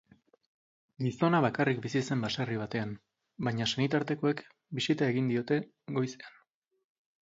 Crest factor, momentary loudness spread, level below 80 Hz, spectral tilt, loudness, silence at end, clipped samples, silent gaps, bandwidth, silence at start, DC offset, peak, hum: 20 dB; 11 LU; -68 dBFS; -6 dB/octave; -31 LUFS; 0.9 s; under 0.1%; none; 7.8 kHz; 1 s; under 0.1%; -12 dBFS; none